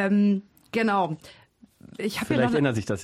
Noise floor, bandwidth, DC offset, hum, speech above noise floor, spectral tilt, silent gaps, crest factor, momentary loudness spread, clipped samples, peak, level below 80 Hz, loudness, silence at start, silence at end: -52 dBFS; 14.5 kHz; under 0.1%; none; 28 dB; -6.5 dB/octave; none; 16 dB; 11 LU; under 0.1%; -10 dBFS; -58 dBFS; -25 LUFS; 0 s; 0 s